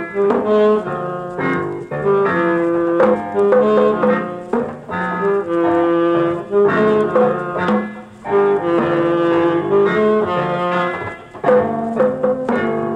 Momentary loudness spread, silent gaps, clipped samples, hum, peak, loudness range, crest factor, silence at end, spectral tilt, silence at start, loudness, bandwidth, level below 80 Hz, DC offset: 8 LU; none; under 0.1%; none; -2 dBFS; 1 LU; 14 dB; 0 s; -8 dB/octave; 0 s; -16 LUFS; 8.8 kHz; -54 dBFS; under 0.1%